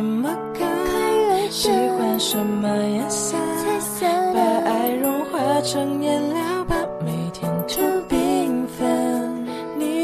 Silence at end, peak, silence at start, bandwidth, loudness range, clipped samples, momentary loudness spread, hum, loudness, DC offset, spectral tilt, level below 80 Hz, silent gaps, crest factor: 0 s; -6 dBFS; 0 s; 14 kHz; 2 LU; under 0.1%; 6 LU; none; -21 LUFS; under 0.1%; -4.5 dB/octave; -46 dBFS; none; 14 dB